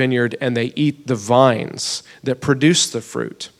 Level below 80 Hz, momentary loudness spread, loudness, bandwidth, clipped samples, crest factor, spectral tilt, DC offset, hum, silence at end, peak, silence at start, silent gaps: -58 dBFS; 11 LU; -18 LUFS; 14.5 kHz; under 0.1%; 18 dB; -4.5 dB/octave; under 0.1%; none; 0.15 s; 0 dBFS; 0 s; none